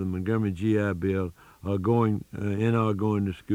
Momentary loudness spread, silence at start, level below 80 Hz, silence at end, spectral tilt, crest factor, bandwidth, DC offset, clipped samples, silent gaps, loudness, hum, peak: 7 LU; 0 s; -58 dBFS; 0 s; -9 dB/octave; 16 dB; 11.5 kHz; under 0.1%; under 0.1%; none; -27 LUFS; none; -10 dBFS